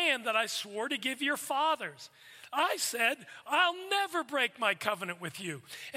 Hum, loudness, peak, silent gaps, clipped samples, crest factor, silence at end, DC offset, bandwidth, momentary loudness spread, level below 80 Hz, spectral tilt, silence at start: none; -31 LUFS; -14 dBFS; none; under 0.1%; 20 dB; 0 s; under 0.1%; 16 kHz; 12 LU; -88 dBFS; -1.5 dB/octave; 0 s